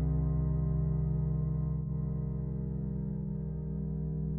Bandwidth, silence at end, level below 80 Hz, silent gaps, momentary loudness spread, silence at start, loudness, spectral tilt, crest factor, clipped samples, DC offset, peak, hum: 2.1 kHz; 0 s; -38 dBFS; none; 5 LU; 0 s; -34 LUFS; -14.5 dB/octave; 12 dB; under 0.1%; 0.1%; -20 dBFS; none